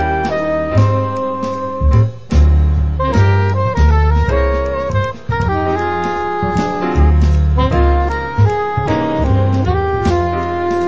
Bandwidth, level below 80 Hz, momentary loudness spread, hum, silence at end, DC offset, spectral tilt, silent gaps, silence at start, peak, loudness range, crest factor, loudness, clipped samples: 7.6 kHz; -18 dBFS; 5 LU; none; 0 s; 2%; -8 dB/octave; none; 0 s; 0 dBFS; 2 LU; 12 dB; -15 LUFS; under 0.1%